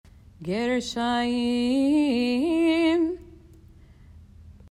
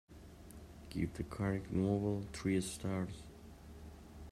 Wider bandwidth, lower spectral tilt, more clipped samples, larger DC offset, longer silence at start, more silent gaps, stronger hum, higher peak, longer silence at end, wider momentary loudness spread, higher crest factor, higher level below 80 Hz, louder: second, 11.5 kHz vs 14.5 kHz; second, -5 dB/octave vs -6.5 dB/octave; neither; neither; first, 0.4 s vs 0.1 s; neither; neither; first, -12 dBFS vs -22 dBFS; first, 0.25 s vs 0 s; second, 8 LU vs 20 LU; second, 12 dB vs 18 dB; about the same, -54 dBFS vs -56 dBFS; first, -24 LUFS vs -39 LUFS